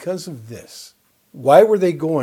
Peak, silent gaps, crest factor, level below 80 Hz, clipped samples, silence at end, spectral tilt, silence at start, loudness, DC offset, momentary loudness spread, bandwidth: 0 dBFS; none; 18 dB; -66 dBFS; under 0.1%; 0 s; -6.5 dB/octave; 0 s; -15 LUFS; under 0.1%; 24 LU; 16 kHz